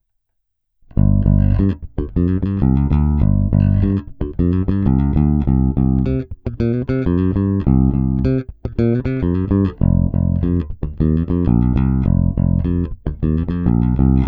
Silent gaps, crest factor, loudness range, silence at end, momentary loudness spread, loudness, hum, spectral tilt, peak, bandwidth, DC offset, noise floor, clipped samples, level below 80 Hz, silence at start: none; 14 dB; 2 LU; 0 s; 7 LU; -17 LUFS; none; -12.5 dB/octave; -2 dBFS; 4.7 kHz; under 0.1%; -71 dBFS; under 0.1%; -22 dBFS; 0.95 s